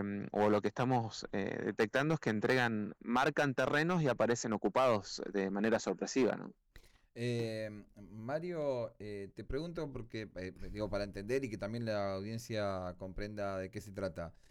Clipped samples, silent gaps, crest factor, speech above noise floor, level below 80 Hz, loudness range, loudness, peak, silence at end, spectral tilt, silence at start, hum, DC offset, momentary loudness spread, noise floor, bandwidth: under 0.1%; none; 12 dB; 25 dB; -58 dBFS; 8 LU; -36 LUFS; -24 dBFS; 0.2 s; -5.5 dB/octave; 0 s; none; under 0.1%; 13 LU; -61 dBFS; 17 kHz